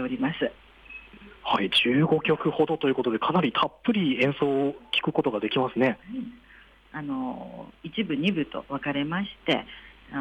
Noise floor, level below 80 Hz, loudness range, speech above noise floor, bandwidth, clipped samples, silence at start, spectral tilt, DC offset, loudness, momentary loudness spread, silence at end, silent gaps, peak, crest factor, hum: -53 dBFS; -58 dBFS; 7 LU; 27 dB; 10.5 kHz; under 0.1%; 0 s; -7 dB/octave; under 0.1%; -26 LUFS; 18 LU; 0 s; none; -12 dBFS; 16 dB; none